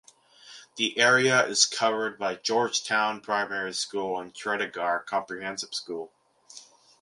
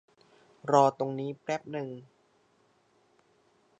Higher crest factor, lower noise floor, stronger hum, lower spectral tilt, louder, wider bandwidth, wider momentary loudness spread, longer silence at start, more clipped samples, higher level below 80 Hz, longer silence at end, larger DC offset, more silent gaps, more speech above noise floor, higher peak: about the same, 22 dB vs 24 dB; second, -53 dBFS vs -68 dBFS; neither; second, -1.5 dB/octave vs -6 dB/octave; first, -26 LUFS vs -29 LUFS; first, 11.5 kHz vs 8.8 kHz; second, 13 LU vs 18 LU; second, 0.45 s vs 0.65 s; neither; first, -76 dBFS vs -82 dBFS; second, 0.4 s vs 1.75 s; neither; neither; second, 26 dB vs 39 dB; about the same, -6 dBFS vs -8 dBFS